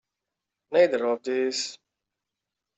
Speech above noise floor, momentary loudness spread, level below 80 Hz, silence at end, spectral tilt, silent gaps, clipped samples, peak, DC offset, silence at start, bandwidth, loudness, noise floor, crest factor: 62 dB; 9 LU; -76 dBFS; 1 s; -2.5 dB/octave; none; under 0.1%; -8 dBFS; under 0.1%; 0.7 s; 8.2 kHz; -25 LUFS; -86 dBFS; 20 dB